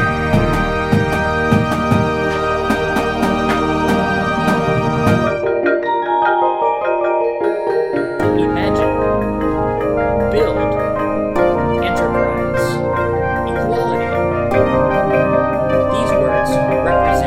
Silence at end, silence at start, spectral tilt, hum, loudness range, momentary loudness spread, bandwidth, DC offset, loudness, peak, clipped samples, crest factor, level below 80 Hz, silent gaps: 0 s; 0 s; -7 dB/octave; none; 1 LU; 3 LU; 16 kHz; under 0.1%; -16 LUFS; 0 dBFS; under 0.1%; 14 dB; -32 dBFS; none